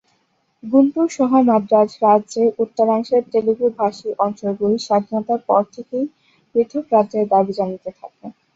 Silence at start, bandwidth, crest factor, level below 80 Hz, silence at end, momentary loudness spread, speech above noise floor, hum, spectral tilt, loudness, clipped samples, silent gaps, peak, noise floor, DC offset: 0.65 s; 7.8 kHz; 16 dB; -64 dBFS; 0.25 s; 10 LU; 47 dB; none; -7 dB/octave; -18 LUFS; under 0.1%; none; -2 dBFS; -65 dBFS; under 0.1%